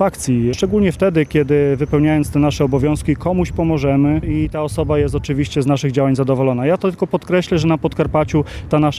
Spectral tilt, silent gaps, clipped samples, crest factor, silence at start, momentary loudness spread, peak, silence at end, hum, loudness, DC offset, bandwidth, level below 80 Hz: -7 dB/octave; none; under 0.1%; 14 dB; 0 s; 4 LU; -2 dBFS; 0 s; none; -17 LUFS; under 0.1%; 14 kHz; -32 dBFS